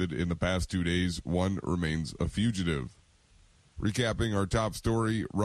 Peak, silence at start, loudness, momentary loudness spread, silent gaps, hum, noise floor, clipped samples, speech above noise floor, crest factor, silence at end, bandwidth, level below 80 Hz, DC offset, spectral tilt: -16 dBFS; 0 s; -30 LUFS; 4 LU; none; none; -61 dBFS; under 0.1%; 32 dB; 16 dB; 0 s; 13.5 kHz; -44 dBFS; under 0.1%; -6 dB/octave